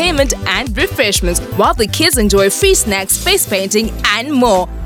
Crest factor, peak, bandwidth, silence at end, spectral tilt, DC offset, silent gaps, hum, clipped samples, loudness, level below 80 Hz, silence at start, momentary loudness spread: 14 dB; 0 dBFS; 19 kHz; 0 s; -3 dB/octave; under 0.1%; none; none; under 0.1%; -12 LUFS; -24 dBFS; 0 s; 4 LU